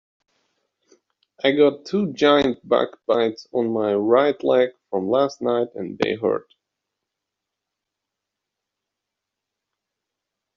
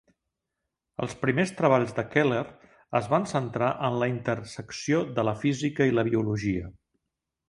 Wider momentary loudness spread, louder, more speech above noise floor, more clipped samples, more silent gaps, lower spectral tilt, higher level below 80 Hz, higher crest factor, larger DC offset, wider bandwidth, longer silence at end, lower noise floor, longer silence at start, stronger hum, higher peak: second, 7 LU vs 11 LU; first, -21 LUFS vs -27 LUFS; first, 64 dB vs 58 dB; neither; neither; second, -3.5 dB/octave vs -6.5 dB/octave; second, -64 dBFS vs -56 dBFS; about the same, 20 dB vs 22 dB; neither; second, 7.4 kHz vs 11.5 kHz; first, 4.15 s vs 0.75 s; about the same, -84 dBFS vs -85 dBFS; first, 1.45 s vs 1 s; neither; first, -2 dBFS vs -6 dBFS